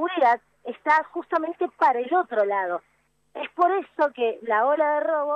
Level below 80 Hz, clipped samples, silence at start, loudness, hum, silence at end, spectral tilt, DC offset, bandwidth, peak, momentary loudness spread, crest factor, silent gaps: -78 dBFS; under 0.1%; 0 s; -23 LUFS; none; 0 s; -5 dB/octave; under 0.1%; 8.2 kHz; -8 dBFS; 10 LU; 16 dB; none